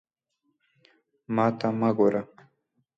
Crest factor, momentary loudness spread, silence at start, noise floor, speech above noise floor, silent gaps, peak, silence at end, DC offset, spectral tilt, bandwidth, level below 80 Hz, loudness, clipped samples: 18 dB; 10 LU; 1.3 s; -77 dBFS; 52 dB; none; -10 dBFS; 0.75 s; under 0.1%; -8.5 dB/octave; 7.6 kHz; -72 dBFS; -25 LUFS; under 0.1%